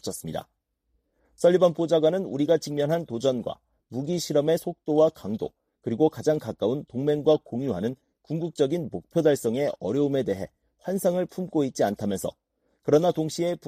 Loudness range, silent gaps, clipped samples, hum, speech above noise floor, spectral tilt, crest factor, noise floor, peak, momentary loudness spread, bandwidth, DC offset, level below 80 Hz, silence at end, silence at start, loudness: 2 LU; none; under 0.1%; none; 49 dB; -6 dB/octave; 18 dB; -74 dBFS; -8 dBFS; 12 LU; 15.5 kHz; under 0.1%; -64 dBFS; 0.1 s; 0.05 s; -26 LUFS